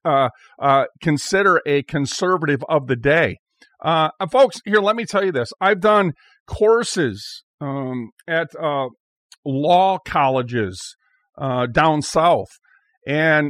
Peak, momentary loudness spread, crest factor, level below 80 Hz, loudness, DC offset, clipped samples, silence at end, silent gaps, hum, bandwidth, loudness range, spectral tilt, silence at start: -4 dBFS; 13 LU; 16 dB; -50 dBFS; -19 LUFS; under 0.1%; under 0.1%; 0 s; 3.39-3.46 s, 6.40-6.46 s, 7.43-7.58 s, 8.12-8.17 s, 9.00-9.30 s, 9.38-9.43 s, 12.97-13.01 s; none; 14.5 kHz; 4 LU; -5 dB/octave; 0.05 s